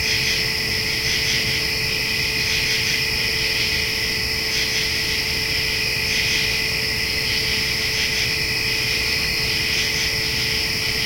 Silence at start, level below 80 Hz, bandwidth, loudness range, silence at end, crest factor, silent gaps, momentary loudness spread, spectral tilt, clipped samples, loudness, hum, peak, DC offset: 0 s; -38 dBFS; 16.5 kHz; 0 LU; 0 s; 14 dB; none; 2 LU; -1.5 dB/octave; under 0.1%; -19 LUFS; none; -6 dBFS; under 0.1%